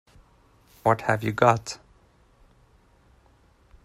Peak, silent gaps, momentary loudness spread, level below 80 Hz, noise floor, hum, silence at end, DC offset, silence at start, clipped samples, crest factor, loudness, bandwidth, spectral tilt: -4 dBFS; none; 15 LU; -58 dBFS; -59 dBFS; none; 2.1 s; under 0.1%; 0.85 s; under 0.1%; 26 dB; -24 LUFS; 15 kHz; -5.5 dB/octave